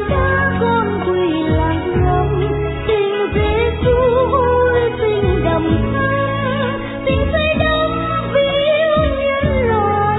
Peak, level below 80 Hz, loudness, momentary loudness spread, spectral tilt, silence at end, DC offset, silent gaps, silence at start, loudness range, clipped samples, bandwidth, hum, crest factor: -2 dBFS; -26 dBFS; -16 LUFS; 4 LU; -10.5 dB/octave; 0 s; under 0.1%; none; 0 s; 1 LU; under 0.1%; 4.1 kHz; none; 12 dB